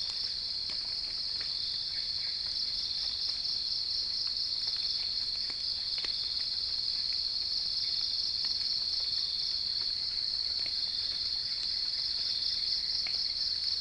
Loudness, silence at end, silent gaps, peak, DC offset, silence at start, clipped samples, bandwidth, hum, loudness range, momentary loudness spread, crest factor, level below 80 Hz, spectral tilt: -30 LUFS; 0 s; none; -20 dBFS; under 0.1%; 0 s; under 0.1%; 10.5 kHz; none; 1 LU; 3 LU; 14 dB; -58 dBFS; 0 dB/octave